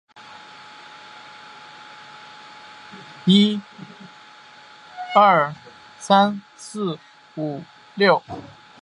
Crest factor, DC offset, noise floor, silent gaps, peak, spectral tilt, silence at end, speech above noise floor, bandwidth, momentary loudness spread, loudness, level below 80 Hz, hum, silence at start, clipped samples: 22 dB; under 0.1%; -46 dBFS; none; -2 dBFS; -5.5 dB/octave; 0.4 s; 27 dB; 11 kHz; 25 LU; -19 LUFS; -68 dBFS; none; 0.3 s; under 0.1%